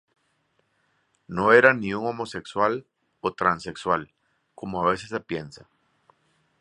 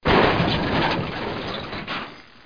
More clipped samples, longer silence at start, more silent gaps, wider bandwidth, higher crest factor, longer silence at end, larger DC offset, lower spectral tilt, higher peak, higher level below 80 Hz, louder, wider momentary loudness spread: neither; first, 1.3 s vs 0.05 s; neither; first, 11 kHz vs 5.2 kHz; first, 26 dB vs 18 dB; first, 1.05 s vs 0.25 s; second, under 0.1% vs 0.4%; about the same, -5.5 dB/octave vs -6.5 dB/octave; first, -2 dBFS vs -6 dBFS; second, -60 dBFS vs -38 dBFS; about the same, -24 LUFS vs -23 LUFS; first, 17 LU vs 13 LU